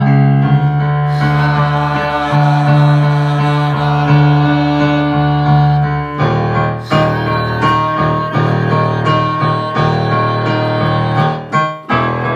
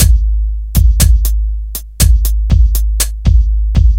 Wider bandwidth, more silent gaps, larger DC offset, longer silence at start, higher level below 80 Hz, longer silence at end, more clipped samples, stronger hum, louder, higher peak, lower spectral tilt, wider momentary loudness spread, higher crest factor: second, 7.2 kHz vs 17 kHz; neither; second, under 0.1% vs 0.8%; about the same, 0 s vs 0 s; second, -36 dBFS vs -10 dBFS; about the same, 0 s vs 0 s; second, under 0.1% vs 0.3%; neither; about the same, -13 LUFS vs -13 LUFS; about the same, 0 dBFS vs 0 dBFS; first, -8 dB/octave vs -4.5 dB/octave; second, 5 LU vs 8 LU; about the same, 12 dB vs 10 dB